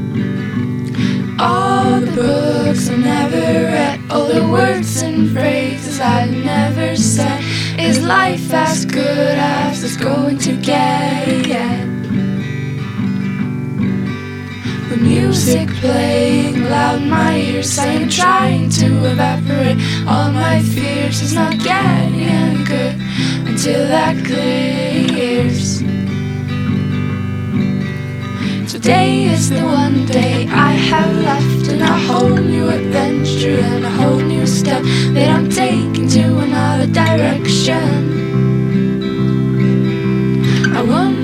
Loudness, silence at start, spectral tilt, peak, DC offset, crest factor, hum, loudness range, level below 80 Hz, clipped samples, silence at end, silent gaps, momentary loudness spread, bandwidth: -14 LUFS; 0 s; -5.5 dB/octave; 0 dBFS; under 0.1%; 14 dB; none; 4 LU; -42 dBFS; under 0.1%; 0 s; none; 6 LU; 16.5 kHz